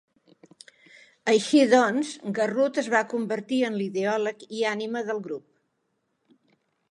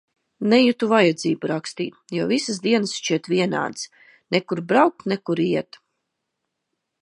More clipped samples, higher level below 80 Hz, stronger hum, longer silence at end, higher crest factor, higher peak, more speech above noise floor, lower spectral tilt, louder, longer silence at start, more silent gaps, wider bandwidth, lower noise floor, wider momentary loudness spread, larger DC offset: neither; second, -82 dBFS vs -70 dBFS; neither; about the same, 1.5 s vs 1.4 s; about the same, 18 dB vs 20 dB; second, -8 dBFS vs -2 dBFS; second, 51 dB vs 58 dB; about the same, -4.5 dB/octave vs -5 dB/octave; second, -25 LUFS vs -21 LUFS; first, 1.25 s vs 0.4 s; neither; about the same, 11.5 kHz vs 11 kHz; second, -75 dBFS vs -79 dBFS; about the same, 11 LU vs 11 LU; neither